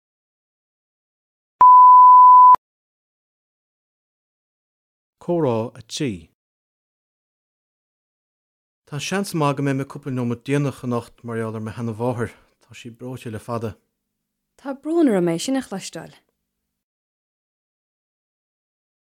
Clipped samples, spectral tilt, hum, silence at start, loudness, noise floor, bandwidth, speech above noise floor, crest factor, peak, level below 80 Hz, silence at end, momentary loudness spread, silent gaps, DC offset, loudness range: under 0.1%; -6 dB/octave; none; 1.6 s; -15 LUFS; -78 dBFS; 13 kHz; 54 dB; 16 dB; -4 dBFS; -62 dBFS; 2.95 s; 26 LU; 2.58-5.13 s, 6.34-8.82 s; under 0.1%; 18 LU